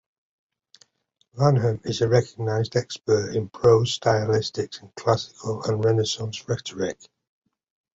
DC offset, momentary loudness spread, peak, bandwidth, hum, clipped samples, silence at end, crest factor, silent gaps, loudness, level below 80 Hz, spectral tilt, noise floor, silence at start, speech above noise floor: under 0.1%; 10 LU; -6 dBFS; 8 kHz; none; under 0.1%; 1 s; 18 dB; none; -24 LUFS; -54 dBFS; -5.5 dB/octave; -70 dBFS; 1.35 s; 47 dB